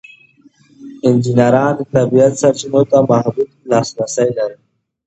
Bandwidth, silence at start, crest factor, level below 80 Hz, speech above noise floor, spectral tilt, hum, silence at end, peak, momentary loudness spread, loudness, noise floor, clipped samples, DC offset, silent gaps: 8.8 kHz; 0.8 s; 14 dB; -54 dBFS; 36 dB; -6.5 dB/octave; none; 0.55 s; 0 dBFS; 8 LU; -14 LUFS; -49 dBFS; under 0.1%; under 0.1%; none